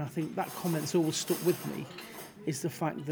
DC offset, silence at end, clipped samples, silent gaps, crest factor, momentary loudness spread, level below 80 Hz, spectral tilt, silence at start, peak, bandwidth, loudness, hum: under 0.1%; 0 s; under 0.1%; none; 18 dB; 12 LU; -74 dBFS; -5 dB/octave; 0 s; -16 dBFS; over 20 kHz; -33 LUFS; none